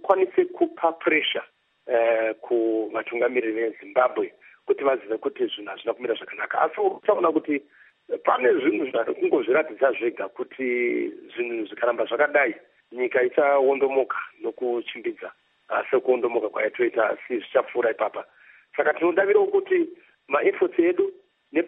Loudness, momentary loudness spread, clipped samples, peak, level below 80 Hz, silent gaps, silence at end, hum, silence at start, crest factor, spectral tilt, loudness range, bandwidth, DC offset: -24 LUFS; 10 LU; under 0.1%; -4 dBFS; -84 dBFS; none; 0 s; none; 0.05 s; 20 dB; -7.5 dB/octave; 3 LU; 3.9 kHz; under 0.1%